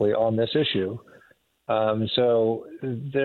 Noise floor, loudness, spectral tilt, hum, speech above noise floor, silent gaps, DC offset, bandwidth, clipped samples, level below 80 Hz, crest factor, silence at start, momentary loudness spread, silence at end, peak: -60 dBFS; -24 LUFS; -8.5 dB/octave; none; 36 dB; none; under 0.1%; 4.4 kHz; under 0.1%; -62 dBFS; 16 dB; 0 s; 11 LU; 0 s; -8 dBFS